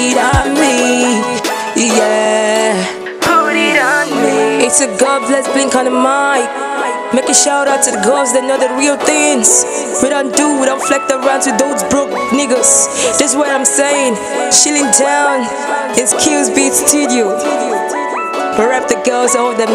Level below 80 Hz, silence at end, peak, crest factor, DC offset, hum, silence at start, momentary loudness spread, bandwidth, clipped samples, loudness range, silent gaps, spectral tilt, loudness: -38 dBFS; 0 s; 0 dBFS; 12 dB; under 0.1%; none; 0 s; 7 LU; 16 kHz; 0.1%; 2 LU; none; -2 dB/octave; -11 LUFS